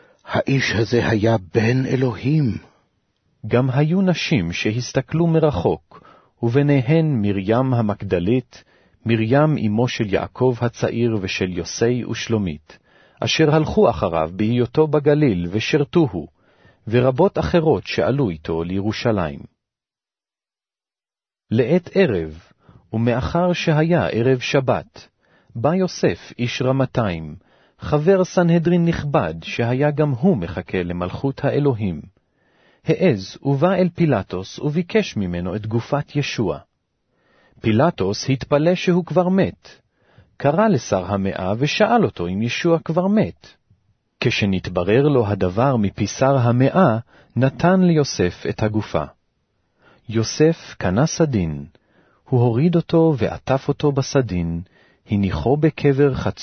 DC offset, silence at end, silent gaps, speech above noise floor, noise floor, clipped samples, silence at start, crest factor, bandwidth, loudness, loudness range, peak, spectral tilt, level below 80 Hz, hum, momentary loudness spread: under 0.1%; 0 s; none; over 71 dB; under -90 dBFS; under 0.1%; 0.25 s; 16 dB; 6.6 kHz; -19 LUFS; 4 LU; -2 dBFS; -6.5 dB/octave; -46 dBFS; none; 8 LU